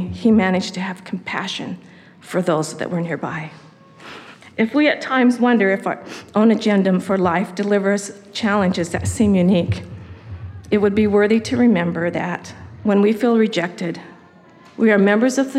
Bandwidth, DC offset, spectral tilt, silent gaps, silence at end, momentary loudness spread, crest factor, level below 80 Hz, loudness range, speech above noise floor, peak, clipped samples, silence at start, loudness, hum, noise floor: 12.5 kHz; under 0.1%; -6 dB/octave; none; 0 s; 17 LU; 16 dB; -50 dBFS; 7 LU; 29 dB; -4 dBFS; under 0.1%; 0 s; -18 LUFS; none; -46 dBFS